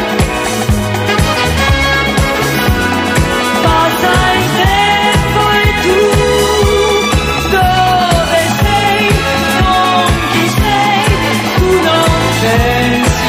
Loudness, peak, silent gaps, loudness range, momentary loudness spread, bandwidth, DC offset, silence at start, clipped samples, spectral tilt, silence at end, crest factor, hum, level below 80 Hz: -10 LUFS; 0 dBFS; none; 1 LU; 3 LU; 16 kHz; under 0.1%; 0 s; under 0.1%; -4.5 dB/octave; 0 s; 10 dB; none; -22 dBFS